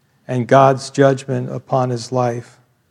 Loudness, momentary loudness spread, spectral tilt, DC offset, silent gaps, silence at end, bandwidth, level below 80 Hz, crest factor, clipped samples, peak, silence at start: -17 LUFS; 12 LU; -6.5 dB/octave; under 0.1%; none; 0.5 s; 11 kHz; -68 dBFS; 18 dB; under 0.1%; 0 dBFS; 0.3 s